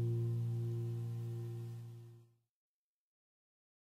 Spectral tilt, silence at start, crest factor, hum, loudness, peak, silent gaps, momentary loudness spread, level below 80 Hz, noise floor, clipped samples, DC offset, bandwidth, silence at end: -9 dB/octave; 0 s; 12 dB; none; -41 LUFS; -30 dBFS; none; 15 LU; -84 dBFS; -63 dBFS; under 0.1%; under 0.1%; 5.2 kHz; 1.75 s